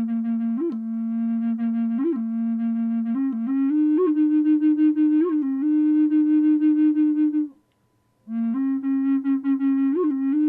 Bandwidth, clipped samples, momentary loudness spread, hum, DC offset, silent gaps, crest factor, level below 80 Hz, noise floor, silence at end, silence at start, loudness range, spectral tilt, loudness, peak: 3.3 kHz; under 0.1%; 7 LU; none; under 0.1%; none; 8 dB; -80 dBFS; -66 dBFS; 0 s; 0 s; 5 LU; -10.5 dB/octave; -22 LUFS; -12 dBFS